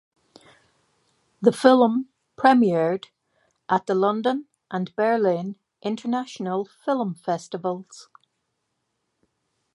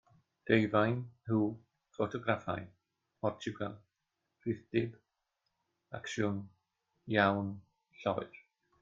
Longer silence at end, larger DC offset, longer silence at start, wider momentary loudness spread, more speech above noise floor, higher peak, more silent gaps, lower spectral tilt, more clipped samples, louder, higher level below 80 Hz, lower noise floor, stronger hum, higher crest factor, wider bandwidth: first, 1.7 s vs 0.55 s; neither; first, 1.4 s vs 0.45 s; second, 14 LU vs 21 LU; about the same, 55 dB vs 52 dB; first, -2 dBFS vs -12 dBFS; neither; about the same, -6.5 dB/octave vs -6.5 dB/octave; neither; first, -23 LUFS vs -35 LUFS; about the same, -74 dBFS vs -70 dBFS; second, -76 dBFS vs -86 dBFS; neither; about the same, 24 dB vs 24 dB; first, 11.5 kHz vs 7.6 kHz